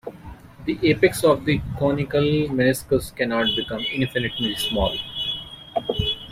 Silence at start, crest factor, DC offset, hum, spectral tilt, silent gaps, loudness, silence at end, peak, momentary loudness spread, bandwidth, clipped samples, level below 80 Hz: 0.05 s; 20 dB; under 0.1%; none; -5 dB/octave; none; -22 LUFS; 0 s; -4 dBFS; 10 LU; 16 kHz; under 0.1%; -42 dBFS